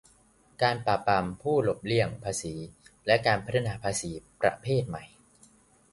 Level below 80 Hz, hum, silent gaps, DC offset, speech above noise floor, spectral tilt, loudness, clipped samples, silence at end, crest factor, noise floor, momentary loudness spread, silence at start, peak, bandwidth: -56 dBFS; none; none; under 0.1%; 34 dB; -4.5 dB/octave; -28 LUFS; under 0.1%; 0.85 s; 22 dB; -62 dBFS; 13 LU; 0.6 s; -8 dBFS; 11.5 kHz